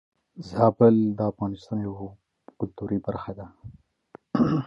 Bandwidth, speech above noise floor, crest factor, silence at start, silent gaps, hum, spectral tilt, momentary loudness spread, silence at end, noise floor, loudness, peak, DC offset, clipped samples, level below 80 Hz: 6.8 kHz; 28 dB; 20 dB; 0.35 s; none; none; -10 dB/octave; 21 LU; 0 s; -53 dBFS; -25 LUFS; -6 dBFS; under 0.1%; under 0.1%; -54 dBFS